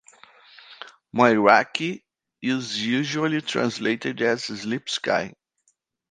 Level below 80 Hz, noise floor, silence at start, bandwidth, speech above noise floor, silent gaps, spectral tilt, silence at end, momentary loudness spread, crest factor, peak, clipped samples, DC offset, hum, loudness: -68 dBFS; -70 dBFS; 0.7 s; 9.8 kHz; 47 dB; none; -4.5 dB/octave; 0.8 s; 16 LU; 24 dB; 0 dBFS; under 0.1%; under 0.1%; none; -23 LUFS